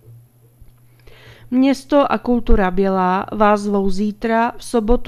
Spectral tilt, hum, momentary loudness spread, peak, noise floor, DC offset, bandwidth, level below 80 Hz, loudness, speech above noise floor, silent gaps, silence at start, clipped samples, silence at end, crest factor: -6.5 dB/octave; none; 5 LU; 0 dBFS; -47 dBFS; under 0.1%; 13 kHz; -28 dBFS; -17 LUFS; 31 dB; none; 0.1 s; under 0.1%; 0 s; 18 dB